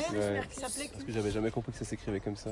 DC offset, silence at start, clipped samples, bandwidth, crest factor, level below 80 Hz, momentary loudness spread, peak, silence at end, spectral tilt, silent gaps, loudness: under 0.1%; 0 s; under 0.1%; 11.5 kHz; 14 dB; -52 dBFS; 6 LU; -20 dBFS; 0 s; -5 dB/octave; none; -35 LUFS